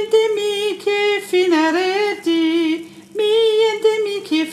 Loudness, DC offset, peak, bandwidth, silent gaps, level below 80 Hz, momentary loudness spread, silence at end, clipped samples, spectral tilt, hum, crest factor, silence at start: -17 LUFS; under 0.1%; -4 dBFS; 14 kHz; none; -72 dBFS; 6 LU; 0 s; under 0.1%; -3 dB/octave; none; 14 dB; 0 s